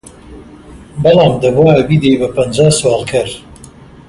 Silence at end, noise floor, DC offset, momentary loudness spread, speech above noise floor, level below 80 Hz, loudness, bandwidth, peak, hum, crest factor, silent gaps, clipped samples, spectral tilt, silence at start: 0.4 s; -36 dBFS; under 0.1%; 10 LU; 26 dB; -38 dBFS; -11 LUFS; 11.5 kHz; 0 dBFS; none; 12 dB; none; under 0.1%; -5.5 dB/octave; 0.3 s